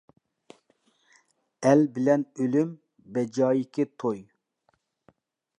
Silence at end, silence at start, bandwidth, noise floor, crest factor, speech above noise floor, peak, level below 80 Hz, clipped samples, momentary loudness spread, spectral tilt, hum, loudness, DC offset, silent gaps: 1.4 s; 1.6 s; 10.5 kHz; -72 dBFS; 20 dB; 48 dB; -8 dBFS; -78 dBFS; under 0.1%; 11 LU; -7.5 dB/octave; none; -26 LUFS; under 0.1%; none